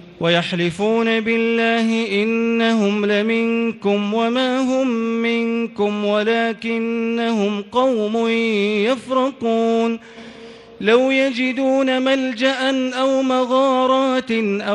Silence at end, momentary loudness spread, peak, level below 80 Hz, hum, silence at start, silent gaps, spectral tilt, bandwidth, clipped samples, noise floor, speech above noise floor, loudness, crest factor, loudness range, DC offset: 0 s; 4 LU; -2 dBFS; -62 dBFS; none; 0 s; none; -5.5 dB/octave; 10.5 kHz; under 0.1%; -39 dBFS; 21 dB; -18 LUFS; 16 dB; 2 LU; under 0.1%